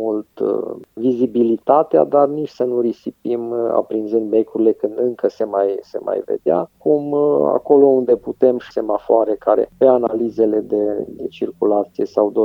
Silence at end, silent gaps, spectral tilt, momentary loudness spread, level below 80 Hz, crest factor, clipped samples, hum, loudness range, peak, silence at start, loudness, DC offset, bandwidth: 0 s; none; -9 dB/octave; 9 LU; -60 dBFS; 16 dB; under 0.1%; none; 4 LU; 0 dBFS; 0 s; -18 LUFS; under 0.1%; 6.2 kHz